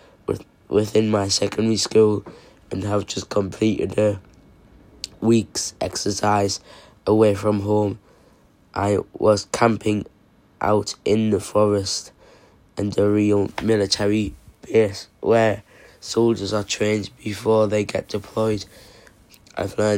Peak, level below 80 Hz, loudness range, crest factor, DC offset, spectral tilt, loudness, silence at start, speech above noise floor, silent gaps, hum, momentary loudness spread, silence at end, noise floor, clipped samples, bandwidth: -4 dBFS; -52 dBFS; 3 LU; 18 dB; under 0.1%; -5 dB/octave; -21 LUFS; 0.3 s; 34 dB; none; none; 11 LU; 0 s; -54 dBFS; under 0.1%; 16 kHz